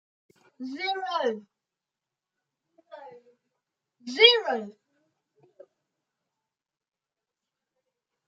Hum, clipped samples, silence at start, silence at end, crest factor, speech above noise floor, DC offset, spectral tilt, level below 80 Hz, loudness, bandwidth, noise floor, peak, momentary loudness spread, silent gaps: none; under 0.1%; 0.6 s; 3.55 s; 30 dB; 64 dB; under 0.1%; -2 dB/octave; under -90 dBFS; -23 LUFS; 7.8 kHz; -89 dBFS; -2 dBFS; 24 LU; none